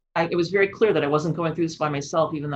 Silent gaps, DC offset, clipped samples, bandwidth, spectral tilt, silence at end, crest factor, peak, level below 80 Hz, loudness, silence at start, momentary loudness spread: none; under 0.1%; under 0.1%; 8.2 kHz; -6 dB/octave; 0 s; 16 dB; -6 dBFS; -60 dBFS; -23 LUFS; 0.15 s; 5 LU